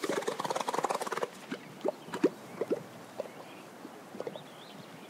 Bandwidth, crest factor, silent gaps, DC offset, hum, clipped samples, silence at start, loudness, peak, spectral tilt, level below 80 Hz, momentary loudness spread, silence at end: 16 kHz; 22 dB; none; under 0.1%; none; under 0.1%; 0 s; -36 LUFS; -14 dBFS; -4 dB/octave; -88 dBFS; 15 LU; 0 s